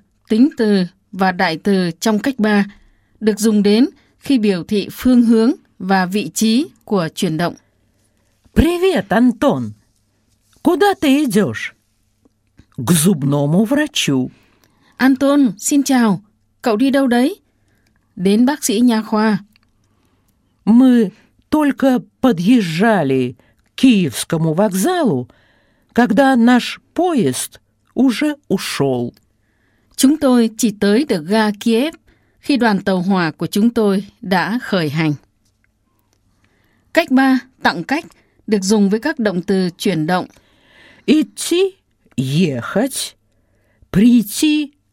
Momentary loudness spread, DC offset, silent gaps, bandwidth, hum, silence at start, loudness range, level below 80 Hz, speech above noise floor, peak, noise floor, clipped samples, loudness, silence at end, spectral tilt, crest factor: 10 LU; under 0.1%; none; 16.5 kHz; none; 0.3 s; 4 LU; -42 dBFS; 47 dB; 0 dBFS; -62 dBFS; under 0.1%; -16 LUFS; 0.25 s; -5 dB/octave; 16 dB